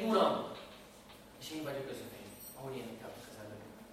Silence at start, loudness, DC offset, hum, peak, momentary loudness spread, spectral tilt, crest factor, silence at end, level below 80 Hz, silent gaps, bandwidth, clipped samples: 0 s; -40 LUFS; under 0.1%; none; -16 dBFS; 21 LU; -5 dB/octave; 22 dB; 0 s; -70 dBFS; none; 16 kHz; under 0.1%